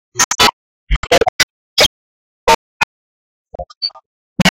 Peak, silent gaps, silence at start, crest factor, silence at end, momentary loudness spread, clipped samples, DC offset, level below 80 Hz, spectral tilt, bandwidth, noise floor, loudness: -2 dBFS; 0.24-0.31 s, 0.53-0.87 s, 0.96-1.03 s, 1.29-1.76 s, 1.86-2.47 s, 2.55-3.45 s, 3.77-3.81 s, 4.06-4.36 s; 0.15 s; 16 dB; 0 s; 12 LU; under 0.1%; under 0.1%; -30 dBFS; -2 dB/octave; 17 kHz; under -90 dBFS; -15 LUFS